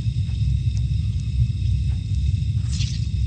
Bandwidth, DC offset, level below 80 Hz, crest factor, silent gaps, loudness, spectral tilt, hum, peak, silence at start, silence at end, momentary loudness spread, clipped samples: 9 kHz; under 0.1%; -26 dBFS; 12 dB; none; -23 LUFS; -6 dB/octave; none; -8 dBFS; 0 s; 0 s; 2 LU; under 0.1%